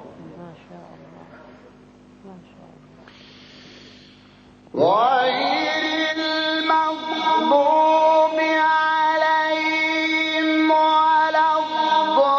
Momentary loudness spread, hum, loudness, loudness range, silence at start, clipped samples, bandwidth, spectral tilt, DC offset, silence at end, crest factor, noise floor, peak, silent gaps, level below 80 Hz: 5 LU; 50 Hz at -55 dBFS; -18 LUFS; 6 LU; 0 s; under 0.1%; 7 kHz; -4 dB/octave; under 0.1%; 0 s; 16 dB; -49 dBFS; -4 dBFS; none; -66 dBFS